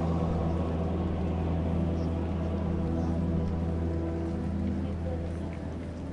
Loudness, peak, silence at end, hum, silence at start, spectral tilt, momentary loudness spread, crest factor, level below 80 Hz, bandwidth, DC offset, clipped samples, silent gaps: -31 LUFS; -18 dBFS; 0 s; none; 0 s; -9.5 dB/octave; 5 LU; 12 dB; -42 dBFS; 6.8 kHz; under 0.1%; under 0.1%; none